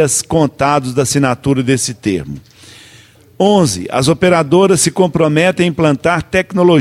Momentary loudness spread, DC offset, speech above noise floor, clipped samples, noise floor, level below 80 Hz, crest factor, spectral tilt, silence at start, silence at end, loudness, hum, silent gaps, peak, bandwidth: 6 LU; under 0.1%; 31 dB; under 0.1%; -43 dBFS; -42 dBFS; 12 dB; -5 dB/octave; 0 s; 0 s; -13 LUFS; none; none; 0 dBFS; 15.5 kHz